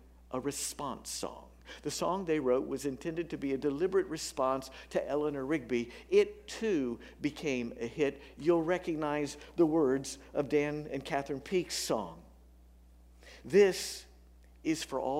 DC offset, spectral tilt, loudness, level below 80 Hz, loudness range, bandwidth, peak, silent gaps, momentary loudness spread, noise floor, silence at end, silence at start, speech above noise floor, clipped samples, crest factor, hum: under 0.1%; -4.5 dB/octave; -33 LUFS; -58 dBFS; 3 LU; 16 kHz; -14 dBFS; none; 10 LU; -58 dBFS; 0 s; 0.3 s; 25 dB; under 0.1%; 20 dB; none